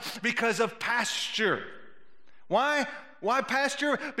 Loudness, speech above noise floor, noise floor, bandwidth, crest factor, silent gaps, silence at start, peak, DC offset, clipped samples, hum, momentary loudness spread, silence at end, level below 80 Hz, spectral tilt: -28 LUFS; 36 dB; -65 dBFS; 16 kHz; 16 dB; none; 0 s; -12 dBFS; under 0.1%; under 0.1%; none; 7 LU; 0 s; -78 dBFS; -2.5 dB/octave